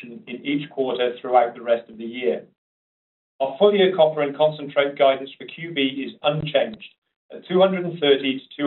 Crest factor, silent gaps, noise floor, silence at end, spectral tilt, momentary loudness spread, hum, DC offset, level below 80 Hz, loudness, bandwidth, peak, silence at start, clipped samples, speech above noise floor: 18 dB; 2.58-3.39 s, 6.98-7.02 s, 7.16-7.29 s; under -90 dBFS; 0 s; -3.5 dB/octave; 11 LU; none; under 0.1%; -64 dBFS; -21 LUFS; 4.2 kHz; -4 dBFS; 0 s; under 0.1%; over 69 dB